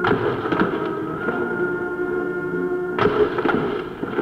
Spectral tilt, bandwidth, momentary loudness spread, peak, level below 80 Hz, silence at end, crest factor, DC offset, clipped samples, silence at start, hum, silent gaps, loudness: -8 dB/octave; 6.4 kHz; 6 LU; -6 dBFS; -48 dBFS; 0 s; 16 dB; under 0.1%; under 0.1%; 0 s; none; none; -22 LUFS